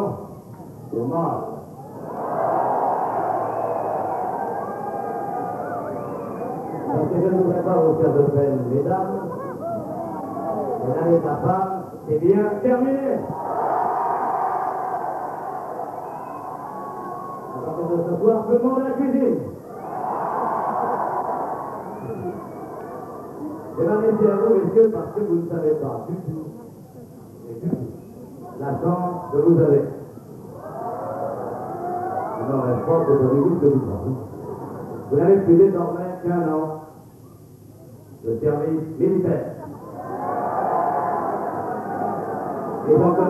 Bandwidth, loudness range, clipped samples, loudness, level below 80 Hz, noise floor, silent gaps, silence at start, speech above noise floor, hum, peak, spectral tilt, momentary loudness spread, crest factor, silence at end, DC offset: 13 kHz; 6 LU; under 0.1%; -22 LUFS; -60 dBFS; -44 dBFS; none; 0 s; 26 dB; none; -4 dBFS; -10 dB/octave; 16 LU; 18 dB; 0 s; under 0.1%